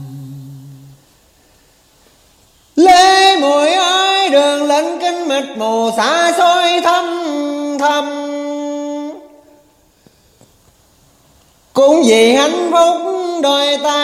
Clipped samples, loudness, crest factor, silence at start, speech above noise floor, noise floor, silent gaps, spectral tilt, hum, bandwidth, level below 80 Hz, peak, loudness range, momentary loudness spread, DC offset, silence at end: under 0.1%; -12 LUFS; 14 dB; 0 s; 39 dB; -51 dBFS; none; -2.5 dB/octave; none; 15.5 kHz; -58 dBFS; 0 dBFS; 11 LU; 13 LU; under 0.1%; 0 s